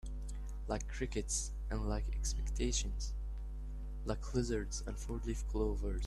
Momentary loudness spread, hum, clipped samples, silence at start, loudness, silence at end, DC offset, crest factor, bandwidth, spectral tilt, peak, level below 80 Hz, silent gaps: 9 LU; none; under 0.1%; 0.05 s; -40 LUFS; 0 s; under 0.1%; 18 dB; 12 kHz; -4.5 dB/octave; -20 dBFS; -40 dBFS; none